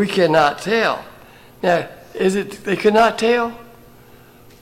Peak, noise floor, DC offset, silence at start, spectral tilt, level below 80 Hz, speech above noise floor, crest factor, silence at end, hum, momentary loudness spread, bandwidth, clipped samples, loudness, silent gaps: -4 dBFS; -45 dBFS; under 0.1%; 0 s; -5 dB/octave; -54 dBFS; 28 dB; 16 dB; 1 s; none; 9 LU; 16.5 kHz; under 0.1%; -18 LUFS; none